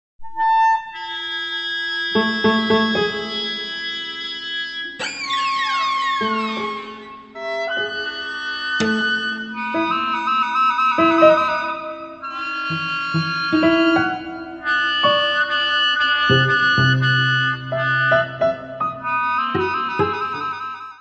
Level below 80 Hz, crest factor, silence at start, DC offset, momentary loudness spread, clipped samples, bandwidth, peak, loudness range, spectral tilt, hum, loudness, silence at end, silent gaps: -56 dBFS; 20 dB; 0.2 s; under 0.1%; 11 LU; under 0.1%; 8.4 kHz; 0 dBFS; 6 LU; -5 dB/octave; none; -19 LUFS; 0.05 s; none